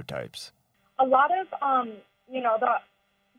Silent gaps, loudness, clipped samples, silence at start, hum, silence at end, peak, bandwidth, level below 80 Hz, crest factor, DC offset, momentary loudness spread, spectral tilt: none; -25 LUFS; under 0.1%; 0 s; none; 0.6 s; -10 dBFS; 14.5 kHz; -70 dBFS; 18 dB; under 0.1%; 19 LU; -4.5 dB/octave